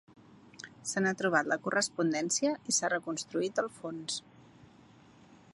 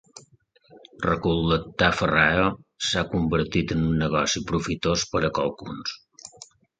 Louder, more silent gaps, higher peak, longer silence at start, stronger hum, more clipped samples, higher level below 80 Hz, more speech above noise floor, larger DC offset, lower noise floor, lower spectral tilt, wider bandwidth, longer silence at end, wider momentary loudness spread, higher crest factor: second, -32 LUFS vs -24 LUFS; neither; second, -12 dBFS vs -4 dBFS; first, 0.3 s vs 0.15 s; neither; neither; second, -76 dBFS vs -42 dBFS; second, 26 dB vs 35 dB; neither; about the same, -58 dBFS vs -59 dBFS; second, -3 dB/octave vs -4.5 dB/octave; first, 11.5 kHz vs 9.2 kHz; second, 0.2 s vs 0.35 s; second, 10 LU vs 13 LU; about the same, 22 dB vs 22 dB